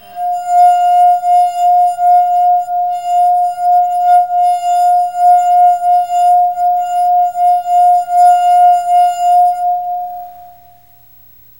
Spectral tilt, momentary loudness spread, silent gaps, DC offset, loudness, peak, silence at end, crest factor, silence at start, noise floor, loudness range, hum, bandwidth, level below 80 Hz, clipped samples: -1 dB/octave; 7 LU; none; 0.4%; -11 LUFS; -2 dBFS; 1.1 s; 10 dB; 0.1 s; -44 dBFS; 1 LU; none; 16 kHz; -60 dBFS; under 0.1%